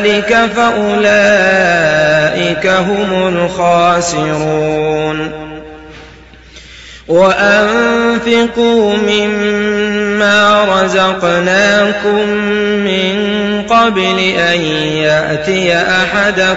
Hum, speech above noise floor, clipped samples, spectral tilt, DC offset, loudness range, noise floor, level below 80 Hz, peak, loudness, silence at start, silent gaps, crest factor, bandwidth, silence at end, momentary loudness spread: none; 26 dB; under 0.1%; -4.5 dB/octave; under 0.1%; 4 LU; -36 dBFS; -40 dBFS; 0 dBFS; -11 LUFS; 0 s; none; 10 dB; 8 kHz; 0 s; 6 LU